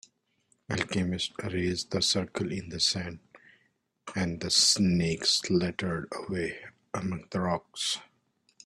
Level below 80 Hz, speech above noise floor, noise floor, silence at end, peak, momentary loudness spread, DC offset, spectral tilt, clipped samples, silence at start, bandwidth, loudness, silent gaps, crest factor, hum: -60 dBFS; 43 dB; -72 dBFS; 0.6 s; -10 dBFS; 12 LU; under 0.1%; -3.5 dB/octave; under 0.1%; 0.7 s; 13 kHz; -29 LUFS; none; 20 dB; none